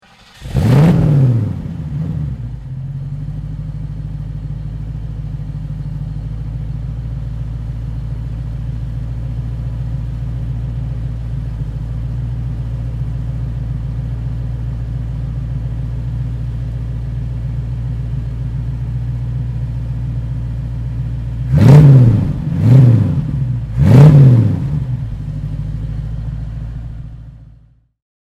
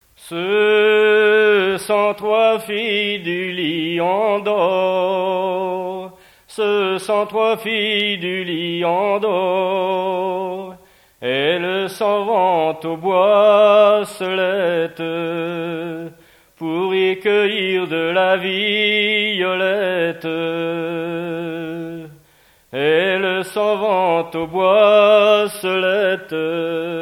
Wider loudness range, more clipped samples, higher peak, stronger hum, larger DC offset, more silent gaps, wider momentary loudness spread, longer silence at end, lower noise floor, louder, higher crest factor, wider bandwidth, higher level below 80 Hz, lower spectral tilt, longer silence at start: first, 14 LU vs 5 LU; first, 0.2% vs under 0.1%; about the same, 0 dBFS vs -2 dBFS; neither; neither; neither; first, 16 LU vs 12 LU; first, 0.8 s vs 0 s; second, -47 dBFS vs -53 dBFS; about the same, -17 LUFS vs -17 LUFS; about the same, 16 dB vs 16 dB; second, 7.2 kHz vs 16 kHz; first, -26 dBFS vs -62 dBFS; first, -9.5 dB/octave vs -5 dB/octave; first, 0.35 s vs 0.2 s